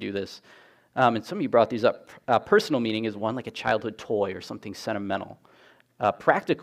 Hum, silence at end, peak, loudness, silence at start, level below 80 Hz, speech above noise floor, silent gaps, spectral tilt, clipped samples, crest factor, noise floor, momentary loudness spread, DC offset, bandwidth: none; 0 s; -4 dBFS; -26 LUFS; 0 s; -66 dBFS; 26 dB; none; -5.5 dB/octave; under 0.1%; 22 dB; -52 dBFS; 14 LU; under 0.1%; 15 kHz